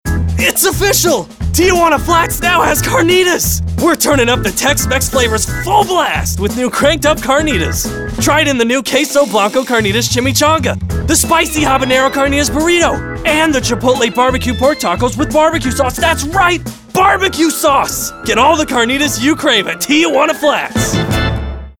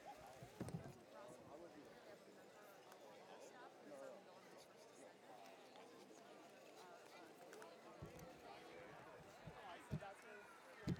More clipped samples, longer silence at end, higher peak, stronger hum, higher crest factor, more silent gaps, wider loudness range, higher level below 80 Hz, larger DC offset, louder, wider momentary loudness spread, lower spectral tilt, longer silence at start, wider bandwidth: neither; about the same, 0.1 s vs 0 s; first, -2 dBFS vs -34 dBFS; neither; second, 12 dB vs 24 dB; neither; about the same, 2 LU vs 4 LU; first, -28 dBFS vs -78 dBFS; neither; first, -12 LUFS vs -59 LUFS; second, 5 LU vs 10 LU; second, -3.5 dB/octave vs -5.5 dB/octave; about the same, 0.05 s vs 0 s; about the same, over 20 kHz vs 19 kHz